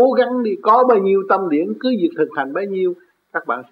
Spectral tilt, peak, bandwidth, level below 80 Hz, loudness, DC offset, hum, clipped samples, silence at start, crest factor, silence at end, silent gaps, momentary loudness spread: -8.5 dB/octave; -2 dBFS; 5.2 kHz; -76 dBFS; -17 LUFS; under 0.1%; none; under 0.1%; 0 s; 14 dB; 0.1 s; none; 10 LU